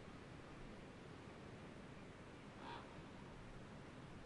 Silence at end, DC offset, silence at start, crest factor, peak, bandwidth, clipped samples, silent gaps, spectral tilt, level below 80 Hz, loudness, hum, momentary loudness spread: 0 s; under 0.1%; 0 s; 16 dB; -40 dBFS; 11 kHz; under 0.1%; none; -6 dB/octave; -66 dBFS; -57 LUFS; none; 3 LU